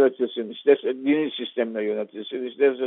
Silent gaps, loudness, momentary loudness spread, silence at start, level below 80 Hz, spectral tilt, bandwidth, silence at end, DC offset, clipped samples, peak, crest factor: none; -24 LUFS; 10 LU; 0 s; -76 dBFS; -3 dB/octave; 4 kHz; 0 s; under 0.1%; under 0.1%; -6 dBFS; 18 dB